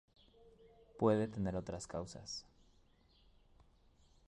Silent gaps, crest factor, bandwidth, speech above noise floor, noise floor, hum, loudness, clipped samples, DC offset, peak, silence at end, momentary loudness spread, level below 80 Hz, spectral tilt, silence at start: none; 24 dB; 11 kHz; 31 dB; -69 dBFS; none; -39 LUFS; under 0.1%; under 0.1%; -20 dBFS; 1.85 s; 13 LU; -62 dBFS; -6 dB/octave; 0.65 s